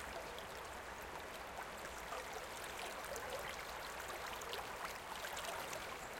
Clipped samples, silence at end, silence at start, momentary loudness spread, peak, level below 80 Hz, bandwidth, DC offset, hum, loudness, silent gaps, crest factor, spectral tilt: under 0.1%; 0 s; 0 s; 4 LU; -28 dBFS; -64 dBFS; 17 kHz; under 0.1%; none; -46 LUFS; none; 20 dB; -2 dB/octave